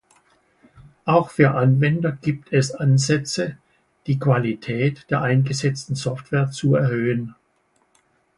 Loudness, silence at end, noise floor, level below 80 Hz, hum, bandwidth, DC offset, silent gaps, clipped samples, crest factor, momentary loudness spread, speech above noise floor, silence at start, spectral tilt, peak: -21 LUFS; 1.05 s; -65 dBFS; -56 dBFS; none; 11.5 kHz; under 0.1%; none; under 0.1%; 20 dB; 9 LU; 45 dB; 1.05 s; -6.5 dB/octave; -2 dBFS